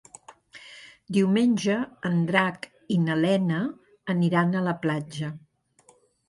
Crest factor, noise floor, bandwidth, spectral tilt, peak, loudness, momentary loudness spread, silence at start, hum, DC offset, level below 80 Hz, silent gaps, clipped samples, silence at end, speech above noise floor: 22 dB; -61 dBFS; 11.5 kHz; -6.5 dB/octave; -4 dBFS; -25 LUFS; 19 LU; 0.3 s; none; under 0.1%; -68 dBFS; none; under 0.1%; 0.9 s; 36 dB